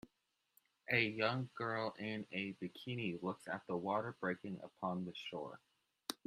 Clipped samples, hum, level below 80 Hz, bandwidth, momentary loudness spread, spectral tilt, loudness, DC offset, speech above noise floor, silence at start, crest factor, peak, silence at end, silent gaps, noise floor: under 0.1%; none; -80 dBFS; 14 kHz; 12 LU; -5.5 dB/octave; -41 LUFS; under 0.1%; 43 dB; 0.05 s; 24 dB; -18 dBFS; 0.1 s; none; -84 dBFS